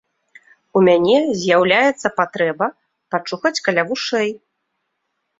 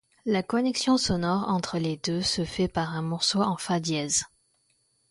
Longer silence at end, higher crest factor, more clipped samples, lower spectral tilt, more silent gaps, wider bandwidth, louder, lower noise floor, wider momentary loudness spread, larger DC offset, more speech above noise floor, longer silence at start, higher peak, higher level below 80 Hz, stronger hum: first, 1 s vs 0.85 s; about the same, 18 dB vs 16 dB; neither; about the same, -4.5 dB/octave vs -4 dB/octave; neither; second, 7.8 kHz vs 11.5 kHz; first, -17 LUFS vs -26 LUFS; first, -73 dBFS vs -69 dBFS; first, 11 LU vs 5 LU; neither; first, 57 dB vs 43 dB; first, 0.75 s vs 0.25 s; first, -2 dBFS vs -12 dBFS; second, -62 dBFS vs -54 dBFS; neither